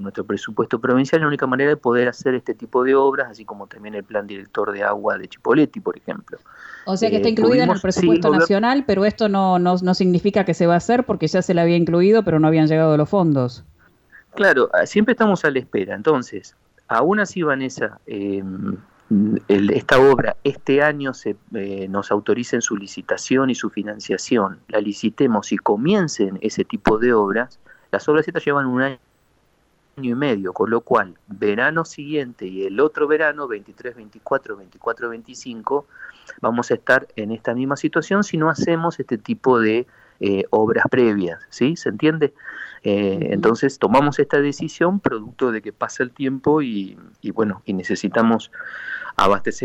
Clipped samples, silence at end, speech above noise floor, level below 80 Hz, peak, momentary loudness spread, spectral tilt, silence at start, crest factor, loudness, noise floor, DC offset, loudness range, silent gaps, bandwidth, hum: under 0.1%; 0 s; 42 dB; -54 dBFS; -2 dBFS; 13 LU; -6 dB/octave; 0 s; 18 dB; -19 LUFS; -61 dBFS; under 0.1%; 6 LU; none; 8.8 kHz; none